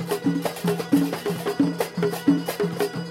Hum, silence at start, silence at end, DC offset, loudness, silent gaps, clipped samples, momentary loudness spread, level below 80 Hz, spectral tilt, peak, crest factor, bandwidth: none; 0 s; 0 s; under 0.1%; -24 LUFS; none; under 0.1%; 5 LU; -64 dBFS; -6 dB/octave; -8 dBFS; 16 dB; 16.5 kHz